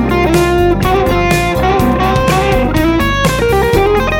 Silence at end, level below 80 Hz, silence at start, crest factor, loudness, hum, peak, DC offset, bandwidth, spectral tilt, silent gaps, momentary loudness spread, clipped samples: 0 s; -20 dBFS; 0 s; 10 dB; -11 LUFS; none; 0 dBFS; 0.3%; 19 kHz; -6 dB/octave; none; 1 LU; under 0.1%